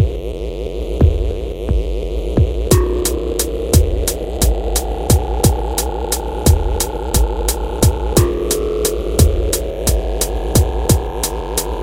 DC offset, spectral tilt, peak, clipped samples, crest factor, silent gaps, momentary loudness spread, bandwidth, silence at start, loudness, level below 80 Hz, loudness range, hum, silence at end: under 0.1%; -5 dB/octave; 0 dBFS; under 0.1%; 16 dB; none; 6 LU; 17 kHz; 0 s; -17 LUFS; -20 dBFS; 1 LU; none; 0 s